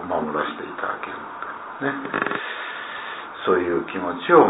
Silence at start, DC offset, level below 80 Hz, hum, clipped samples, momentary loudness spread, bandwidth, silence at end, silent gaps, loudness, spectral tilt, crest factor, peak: 0 s; under 0.1%; -62 dBFS; none; under 0.1%; 11 LU; 4 kHz; 0 s; none; -26 LUFS; -9 dB/octave; 22 dB; -2 dBFS